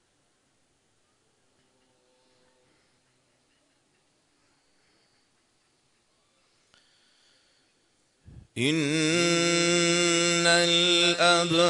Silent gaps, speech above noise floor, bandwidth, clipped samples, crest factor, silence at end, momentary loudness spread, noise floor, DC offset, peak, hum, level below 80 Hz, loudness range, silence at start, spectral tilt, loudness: none; 47 dB; 11 kHz; under 0.1%; 20 dB; 0 s; 6 LU; -70 dBFS; under 0.1%; -10 dBFS; none; -70 dBFS; 13 LU; 8.35 s; -3 dB/octave; -22 LUFS